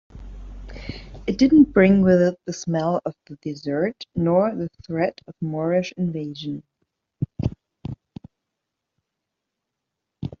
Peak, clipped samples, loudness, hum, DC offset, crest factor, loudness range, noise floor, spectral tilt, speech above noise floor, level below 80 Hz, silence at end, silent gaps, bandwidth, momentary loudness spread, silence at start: -4 dBFS; under 0.1%; -22 LUFS; none; under 0.1%; 20 dB; 16 LU; -82 dBFS; -7 dB/octave; 61 dB; -46 dBFS; 0.1 s; none; 7.4 kHz; 22 LU; 0.15 s